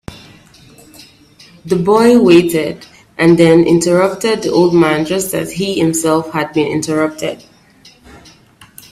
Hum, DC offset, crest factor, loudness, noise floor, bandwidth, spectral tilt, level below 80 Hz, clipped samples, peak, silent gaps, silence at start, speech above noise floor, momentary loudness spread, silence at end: none; under 0.1%; 14 dB; -12 LUFS; -45 dBFS; 14.5 kHz; -5.5 dB/octave; -48 dBFS; under 0.1%; 0 dBFS; none; 0.1 s; 33 dB; 15 LU; 1.55 s